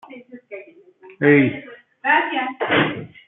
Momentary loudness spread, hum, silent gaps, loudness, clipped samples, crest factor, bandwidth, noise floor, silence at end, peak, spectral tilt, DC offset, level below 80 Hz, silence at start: 23 LU; none; none; -18 LUFS; under 0.1%; 18 dB; 4 kHz; -47 dBFS; 0.2 s; -2 dBFS; -10 dB/octave; under 0.1%; -64 dBFS; 0.1 s